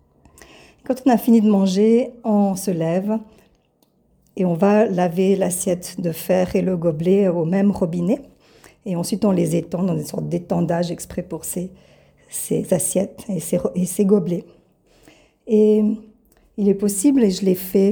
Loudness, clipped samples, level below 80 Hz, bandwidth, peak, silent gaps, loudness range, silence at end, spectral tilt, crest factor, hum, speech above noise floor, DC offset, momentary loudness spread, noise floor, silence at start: -19 LUFS; under 0.1%; -54 dBFS; over 20 kHz; -4 dBFS; none; 5 LU; 0 s; -6.5 dB/octave; 16 dB; none; 43 dB; under 0.1%; 11 LU; -61 dBFS; 0.9 s